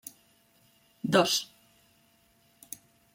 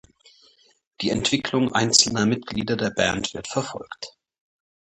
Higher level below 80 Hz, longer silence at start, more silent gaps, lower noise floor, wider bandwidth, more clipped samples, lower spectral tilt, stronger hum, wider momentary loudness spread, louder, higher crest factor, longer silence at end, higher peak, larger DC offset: second, -74 dBFS vs -52 dBFS; about the same, 1.05 s vs 1 s; neither; first, -66 dBFS vs -58 dBFS; first, 16.5 kHz vs 11.5 kHz; neither; about the same, -3.5 dB/octave vs -3 dB/octave; neither; first, 22 LU vs 18 LU; second, -27 LUFS vs -22 LUFS; about the same, 24 dB vs 24 dB; first, 1.7 s vs 0.75 s; second, -10 dBFS vs -2 dBFS; neither